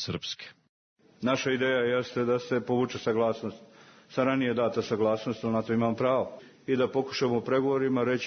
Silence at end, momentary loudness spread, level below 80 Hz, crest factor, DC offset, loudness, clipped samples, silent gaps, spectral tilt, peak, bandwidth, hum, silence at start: 0 s; 10 LU; -70 dBFS; 16 dB; under 0.1%; -28 LUFS; under 0.1%; 0.69-0.96 s; -6 dB/octave; -12 dBFS; 6.6 kHz; none; 0 s